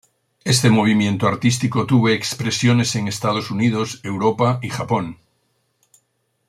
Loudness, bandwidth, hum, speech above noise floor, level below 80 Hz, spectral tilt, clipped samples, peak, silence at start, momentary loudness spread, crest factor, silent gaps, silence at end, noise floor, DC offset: -18 LUFS; 15 kHz; none; 50 dB; -56 dBFS; -5 dB/octave; under 0.1%; -2 dBFS; 0.45 s; 8 LU; 16 dB; none; 1.35 s; -68 dBFS; under 0.1%